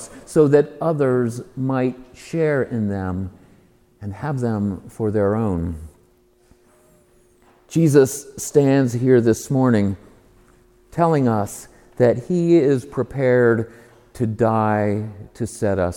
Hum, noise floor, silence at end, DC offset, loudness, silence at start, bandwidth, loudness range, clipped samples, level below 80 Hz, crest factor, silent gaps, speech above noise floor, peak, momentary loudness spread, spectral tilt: none; -56 dBFS; 0 s; under 0.1%; -19 LUFS; 0 s; 18.5 kHz; 7 LU; under 0.1%; -50 dBFS; 20 dB; none; 38 dB; 0 dBFS; 14 LU; -7.5 dB/octave